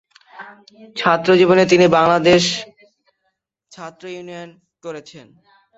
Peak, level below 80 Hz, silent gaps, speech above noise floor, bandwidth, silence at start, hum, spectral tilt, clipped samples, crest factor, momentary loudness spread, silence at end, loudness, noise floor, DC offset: 0 dBFS; -56 dBFS; none; 56 dB; 8 kHz; 0.4 s; none; -5 dB/octave; under 0.1%; 18 dB; 23 LU; 0.6 s; -14 LUFS; -72 dBFS; under 0.1%